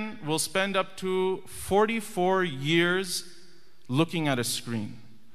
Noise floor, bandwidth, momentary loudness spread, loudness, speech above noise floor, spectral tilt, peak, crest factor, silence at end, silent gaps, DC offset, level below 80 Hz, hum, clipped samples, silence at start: -58 dBFS; 15 kHz; 8 LU; -27 LUFS; 31 dB; -4 dB/octave; -8 dBFS; 20 dB; 0.35 s; none; 0.8%; -60 dBFS; none; under 0.1%; 0 s